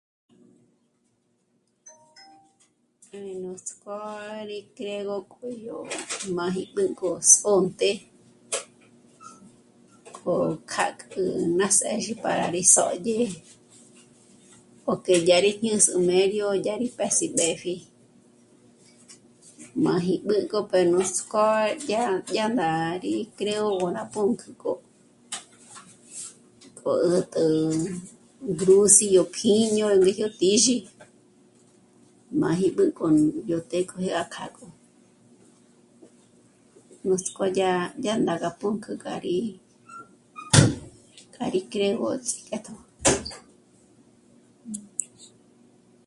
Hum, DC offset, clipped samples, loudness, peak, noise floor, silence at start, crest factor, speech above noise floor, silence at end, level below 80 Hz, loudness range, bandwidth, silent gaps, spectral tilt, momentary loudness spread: none; under 0.1%; under 0.1%; -23 LUFS; 0 dBFS; -70 dBFS; 1.85 s; 26 dB; 46 dB; 0.8 s; -58 dBFS; 12 LU; 11.5 kHz; none; -3.5 dB/octave; 18 LU